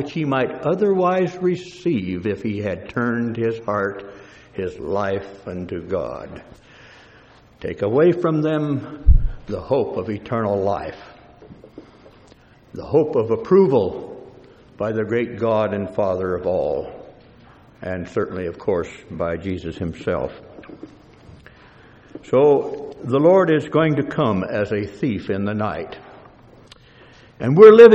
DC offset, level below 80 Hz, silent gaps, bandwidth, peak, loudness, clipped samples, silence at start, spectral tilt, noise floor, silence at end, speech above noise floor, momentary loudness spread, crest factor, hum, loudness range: under 0.1%; -32 dBFS; none; 7.8 kHz; 0 dBFS; -20 LUFS; under 0.1%; 0 s; -8 dB/octave; -49 dBFS; 0 s; 31 dB; 18 LU; 20 dB; none; 8 LU